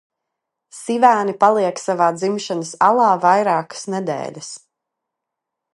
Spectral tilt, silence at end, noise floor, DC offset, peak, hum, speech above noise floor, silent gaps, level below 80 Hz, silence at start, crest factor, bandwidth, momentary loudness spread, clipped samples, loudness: -4.5 dB/octave; 1.2 s; -82 dBFS; under 0.1%; 0 dBFS; none; 64 dB; none; -72 dBFS; 0.75 s; 18 dB; 11.5 kHz; 15 LU; under 0.1%; -17 LUFS